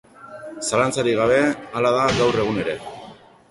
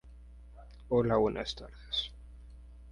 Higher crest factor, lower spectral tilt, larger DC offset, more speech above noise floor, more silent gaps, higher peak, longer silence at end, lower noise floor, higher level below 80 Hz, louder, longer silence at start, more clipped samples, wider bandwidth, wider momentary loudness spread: about the same, 18 dB vs 20 dB; second, -4.5 dB/octave vs -6 dB/octave; neither; about the same, 24 dB vs 21 dB; neither; first, -4 dBFS vs -14 dBFS; first, 0.35 s vs 0 s; second, -44 dBFS vs -52 dBFS; about the same, -48 dBFS vs -50 dBFS; first, -20 LUFS vs -32 LUFS; first, 0.2 s vs 0.05 s; neither; about the same, 11.5 kHz vs 11 kHz; second, 19 LU vs 25 LU